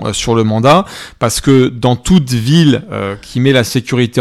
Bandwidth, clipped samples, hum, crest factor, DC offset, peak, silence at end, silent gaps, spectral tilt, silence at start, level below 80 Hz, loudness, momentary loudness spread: 15 kHz; under 0.1%; none; 12 dB; under 0.1%; 0 dBFS; 0 s; none; -5.5 dB/octave; 0 s; -34 dBFS; -12 LUFS; 9 LU